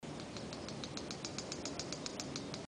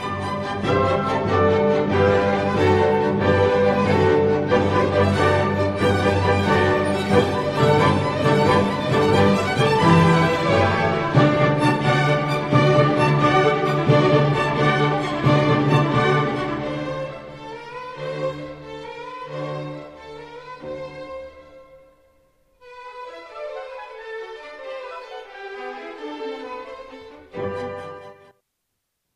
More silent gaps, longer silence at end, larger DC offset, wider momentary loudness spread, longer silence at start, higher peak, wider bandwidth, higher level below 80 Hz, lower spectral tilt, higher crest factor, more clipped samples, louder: neither; second, 0 s vs 1 s; neither; second, 3 LU vs 19 LU; about the same, 0 s vs 0 s; second, -20 dBFS vs -2 dBFS; about the same, 13 kHz vs 12.5 kHz; second, -64 dBFS vs -48 dBFS; second, -3.5 dB/octave vs -7 dB/octave; first, 24 dB vs 18 dB; neither; second, -43 LUFS vs -19 LUFS